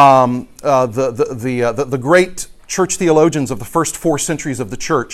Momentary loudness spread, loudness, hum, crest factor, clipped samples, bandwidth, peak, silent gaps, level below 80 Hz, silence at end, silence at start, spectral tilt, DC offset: 8 LU; -16 LUFS; none; 14 dB; under 0.1%; 15.5 kHz; 0 dBFS; none; -44 dBFS; 0 s; 0 s; -5 dB/octave; under 0.1%